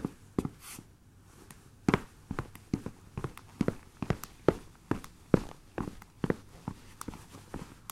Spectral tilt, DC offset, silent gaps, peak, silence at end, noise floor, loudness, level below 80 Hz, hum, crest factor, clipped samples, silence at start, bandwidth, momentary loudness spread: -6.5 dB/octave; under 0.1%; none; -6 dBFS; 0.05 s; -57 dBFS; -36 LUFS; -52 dBFS; none; 30 dB; under 0.1%; 0 s; 16 kHz; 16 LU